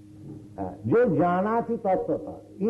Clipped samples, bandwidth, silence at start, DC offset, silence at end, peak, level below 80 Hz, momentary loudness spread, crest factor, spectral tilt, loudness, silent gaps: under 0.1%; 5.4 kHz; 0 s; under 0.1%; 0 s; -14 dBFS; -58 dBFS; 20 LU; 12 dB; -10 dB/octave; -25 LUFS; none